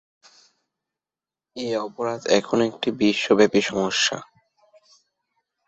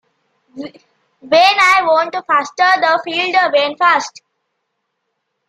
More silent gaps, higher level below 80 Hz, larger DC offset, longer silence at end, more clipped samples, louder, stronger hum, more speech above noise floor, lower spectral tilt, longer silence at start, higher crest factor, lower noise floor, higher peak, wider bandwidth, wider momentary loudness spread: neither; about the same, -62 dBFS vs -64 dBFS; neither; about the same, 1.45 s vs 1.4 s; neither; second, -22 LUFS vs -13 LUFS; neither; first, over 69 dB vs 58 dB; first, -3.5 dB/octave vs -1.5 dB/octave; first, 1.55 s vs 0.55 s; about the same, 20 dB vs 16 dB; first, under -90 dBFS vs -72 dBFS; second, -4 dBFS vs 0 dBFS; second, 8.2 kHz vs 15 kHz; second, 11 LU vs 21 LU